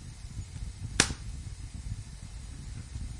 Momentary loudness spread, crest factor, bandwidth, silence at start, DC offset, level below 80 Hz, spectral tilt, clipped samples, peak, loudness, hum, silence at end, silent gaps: 17 LU; 34 dB; 11.5 kHz; 0 s; under 0.1%; -42 dBFS; -2.5 dB/octave; under 0.1%; -4 dBFS; -35 LUFS; none; 0 s; none